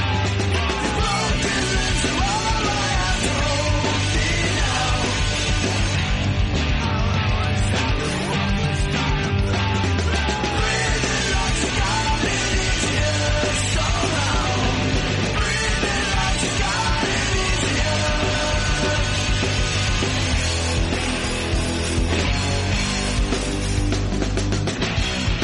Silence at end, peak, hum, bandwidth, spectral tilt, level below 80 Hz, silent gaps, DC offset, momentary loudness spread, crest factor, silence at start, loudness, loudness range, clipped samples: 0 s; -8 dBFS; none; 11.5 kHz; -4 dB/octave; -26 dBFS; none; under 0.1%; 2 LU; 12 dB; 0 s; -21 LUFS; 1 LU; under 0.1%